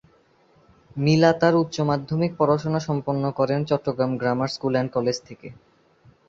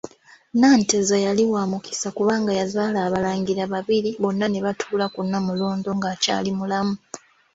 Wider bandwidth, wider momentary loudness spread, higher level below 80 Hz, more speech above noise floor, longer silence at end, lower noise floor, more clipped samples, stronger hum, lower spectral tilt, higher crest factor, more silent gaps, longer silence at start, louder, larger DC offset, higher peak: about the same, 7.6 kHz vs 8 kHz; about the same, 10 LU vs 8 LU; about the same, -58 dBFS vs -60 dBFS; first, 37 dB vs 19 dB; first, 0.75 s vs 0.35 s; first, -59 dBFS vs -41 dBFS; neither; neither; first, -6.5 dB/octave vs -4.5 dB/octave; about the same, 20 dB vs 16 dB; neither; first, 0.95 s vs 0.05 s; about the same, -23 LUFS vs -22 LUFS; neither; first, -2 dBFS vs -6 dBFS